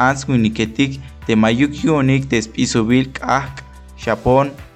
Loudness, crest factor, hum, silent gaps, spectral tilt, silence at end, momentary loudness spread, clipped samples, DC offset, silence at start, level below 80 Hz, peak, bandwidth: -17 LUFS; 14 dB; none; none; -5.5 dB/octave; 0.1 s; 7 LU; under 0.1%; under 0.1%; 0 s; -38 dBFS; -2 dBFS; 9.6 kHz